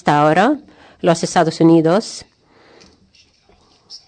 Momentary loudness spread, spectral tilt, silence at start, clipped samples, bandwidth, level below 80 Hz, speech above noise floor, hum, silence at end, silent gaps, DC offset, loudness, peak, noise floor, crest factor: 13 LU; -6 dB/octave; 0.05 s; under 0.1%; 9.4 kHz; -58 dBFS; 40 dB; none; 0.1 s; none; under 0.1%; -15 LUFS; -2 dBFS; -53 dBFS; 14 dB